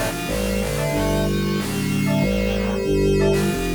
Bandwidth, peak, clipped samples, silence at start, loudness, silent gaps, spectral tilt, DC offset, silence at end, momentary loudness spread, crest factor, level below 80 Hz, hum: 19.5 kHz; -8 dBFS; under 0.1%; 0 s; -21 LUFS; none; -5.5 dB/octave; under 0.1%; 0 s; 4 LU; 12 dB; -30 dBFS; none